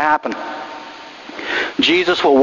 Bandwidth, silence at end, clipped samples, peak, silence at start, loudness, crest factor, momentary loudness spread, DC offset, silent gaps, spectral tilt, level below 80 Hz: 7.4 kHz; 0 s; under 0.1%; 0 dBFS; 0 s; -17 LUFS; 16 dB; 19 LU; under 0.1%; none; -3.5 dB/octave; -56 dBFS